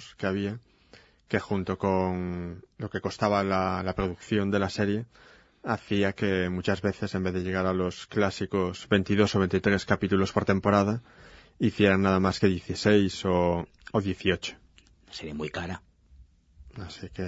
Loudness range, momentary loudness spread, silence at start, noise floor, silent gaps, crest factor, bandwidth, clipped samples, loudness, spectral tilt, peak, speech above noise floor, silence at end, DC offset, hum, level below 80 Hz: 6 LU; 14 LU; 0 s; -57 dBFS; none; 22 dB; 8 kHz; under 0.1%; -27 LUFS; -6.5 dB/octave; -6 dBFS; 31 dB; 0 s; under 0.1%; none; -52 dBFS